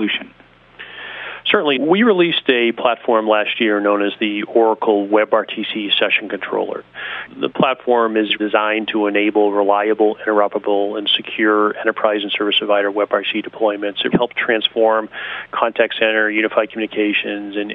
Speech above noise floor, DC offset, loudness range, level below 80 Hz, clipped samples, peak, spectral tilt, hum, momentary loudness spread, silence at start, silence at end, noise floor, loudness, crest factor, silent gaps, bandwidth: 23 dB; under 0.1%; 2 LU; -62 dBFS; under 0.1%; 0 dBFS; -8 dB/octave; none; 9 LU; 0 s; 0 s; -40 dBFS; -17 LUFS; 16 dB; none; 4.9 kHz